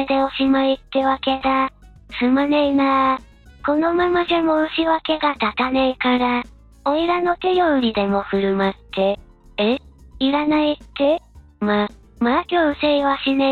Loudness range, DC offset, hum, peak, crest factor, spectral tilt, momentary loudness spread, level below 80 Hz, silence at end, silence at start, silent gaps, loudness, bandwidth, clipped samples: 2 LU; under 0.1%; none; -4 dBFS; 14 dB; -7 dB/octave; 7 LU; -46 dBFS; 0 s; 0 s; none; -19 LUFS; 4.7 kHz; under 0.1%